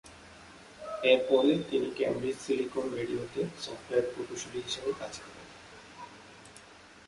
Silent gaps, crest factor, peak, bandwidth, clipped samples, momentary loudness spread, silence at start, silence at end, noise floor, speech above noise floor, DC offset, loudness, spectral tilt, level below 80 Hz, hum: none; 22 dB; -10 dBFS; 11.5 kHz; under 0.1%; 25 LU; 0.05 s; 0.1 s; -54 dBFS; 23 dB; under 0.1%; -31 LUFS; -4.5 dB/octave; -66 dBFS; none